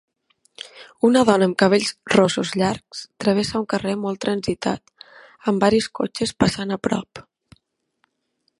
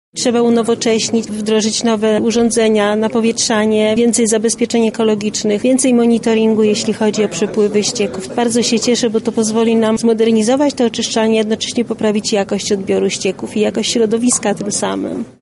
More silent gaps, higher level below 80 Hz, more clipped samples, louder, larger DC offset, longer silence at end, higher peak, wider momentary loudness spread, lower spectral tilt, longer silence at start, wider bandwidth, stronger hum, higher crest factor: neither; about the same, -52 dBFS vs -52 dBFS; neither; second, -20 LUFS vs -14 LUFS; neither; first, 1.4 s vs 0.1 s; about the same, 0 dBFS vs -2 dBFS; first, 15 LU vs 5 LU; first, -5 dB/octave vs -3.5 dB/octave; first, 0.6 s vs 0.15 s; about the same, 11.5 kHz vs 11.5 kHz; neither; first, 22 dB vs 12 dB